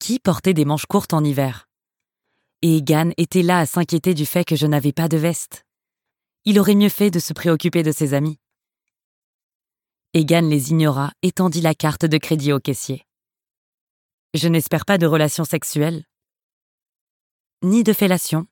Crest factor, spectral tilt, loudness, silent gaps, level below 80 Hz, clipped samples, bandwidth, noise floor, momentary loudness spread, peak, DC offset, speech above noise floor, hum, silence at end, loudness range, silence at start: 18 dB; -5.5 dB/octave; -18 LUFS; 9.04-9.60 s, 13.57-14.30 s, 16.43-17.57 s; -58 dBFS; under 0.1%; 17.5 kHz; -89 dBFS; 8 LU; -2 dBFS; under 0.1%; 72 dB; none; 0.05 s; 3 LU; 0 s